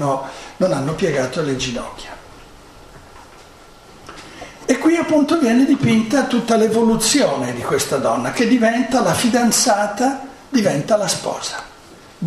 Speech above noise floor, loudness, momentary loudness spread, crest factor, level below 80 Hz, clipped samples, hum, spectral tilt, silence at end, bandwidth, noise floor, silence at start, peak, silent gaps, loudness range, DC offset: 26 dB; -17 LUFS; 17 LU; 16 dB; -48 dBFS; under 0.1%; none; -4 dB/octave; 0 s; 15 kHz; -43 dBFS; 0 s; -2 dBFS; none; 10 LU; under 0.1%